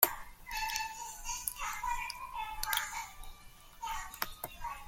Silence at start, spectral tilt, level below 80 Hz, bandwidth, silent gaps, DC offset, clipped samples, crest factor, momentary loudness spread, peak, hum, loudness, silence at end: 0 s; 0 dB/octave; -52 dBFS; 17 kHz; none; under 0.1%; under 0.1%; 34 dB; 13 LU; -4 dBFS; none; -38 LUFS; 0 s